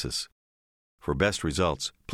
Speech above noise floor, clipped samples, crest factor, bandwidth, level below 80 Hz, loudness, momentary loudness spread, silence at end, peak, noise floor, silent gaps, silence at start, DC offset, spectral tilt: over 62 dB; under 0.1%; 20 dB; 16.5 kHz; -46 dBFS; -29 LUFS; 11 LU; 0 s; -10 dBFS; under -90 dBFS; 0.32-0.98 s; 0 s; under 0.1%; -4 dB/octave